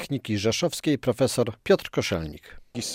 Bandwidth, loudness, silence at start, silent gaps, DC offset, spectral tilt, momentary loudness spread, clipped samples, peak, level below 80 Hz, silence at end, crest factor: 16 kHz; -25 LUFS; 0 s; none; under 0.1%; -4.5 dB/octave; 13 LU; under 0.1%; -8 dBFS; -52 dBFS; 0 s; 18 dB